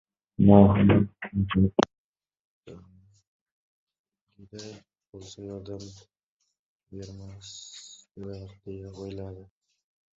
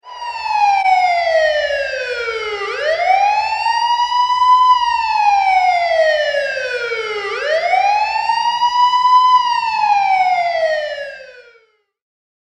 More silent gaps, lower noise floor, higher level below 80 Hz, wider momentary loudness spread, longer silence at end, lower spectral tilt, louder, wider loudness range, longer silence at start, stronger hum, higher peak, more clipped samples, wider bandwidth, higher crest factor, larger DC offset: first, 1.98-2.14 s, 2.40-2.63 s, 3.27-3.46 s, 3.52-3.87 s, 3.99-4.04 s, 4.21-4.27 s, 6.23-6.40 s, 6.59-6.80 s vs none; about the same, -57 dBFS vs -55 dBFS; first, -48 dBFS vs -54 dBFS; first, 27 LU vs 10 LU; second, 0.8 s vs 1.1 s; first, -7.5 dB/octave vs -0.5 dB/octave; second, -21 LUFS vs -15 LUFS; first, 23 LU vs 3 LU; first, 0.4 s vs 0.05 s; neither; about the same, -2 dBFS vs -2 dBFS; neither; second, 7.6 kHz vs 9.6 kHz; first, 26 dB vs 14 dB; neither